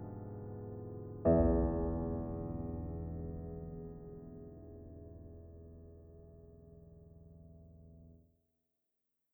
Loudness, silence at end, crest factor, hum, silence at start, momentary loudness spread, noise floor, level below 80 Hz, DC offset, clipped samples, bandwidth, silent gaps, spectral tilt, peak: -38 LUFS; 1.15 s; 22 dB; none; 0 s; 27 LU; -86 dBFS; -48 dBFS; under 0.1%; under 0.1%; 2.8 kHz; none; -13.5 dB/octave; -18 dBFS